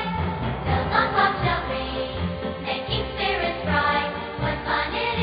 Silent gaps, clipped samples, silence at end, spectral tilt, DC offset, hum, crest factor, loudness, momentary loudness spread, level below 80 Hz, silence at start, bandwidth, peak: none; under 0.1%; 0 s; -10 dB/octave; under 0.1%; none; 18 dB; -24 LUFS; 7 LU; -36 dBFS; 0 s; 5.2 kHz; -6 dBFS